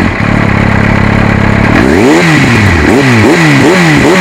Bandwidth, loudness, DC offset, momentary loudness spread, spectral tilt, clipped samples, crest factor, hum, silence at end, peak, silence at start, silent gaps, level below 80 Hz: 16.5 kHz; -6 LUFS; under 0.1%; 3 LU; -6 dB/octave; 7%; 6 dB; none; 0 s; 0 dBFS; 0 s; none; -20 dBFS